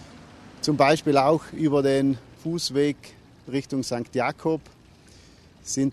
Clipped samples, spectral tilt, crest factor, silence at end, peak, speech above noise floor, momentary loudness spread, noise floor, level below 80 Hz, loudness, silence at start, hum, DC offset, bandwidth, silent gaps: under 0.1%; -5 dB/octave; 20 dB; 0 s; -6 dBFS; 28 dB; 11 LU; -51 dBFS; -58 dBFS; -24 LUFS; 0 s; none; under 0.1%; 13 kHz; none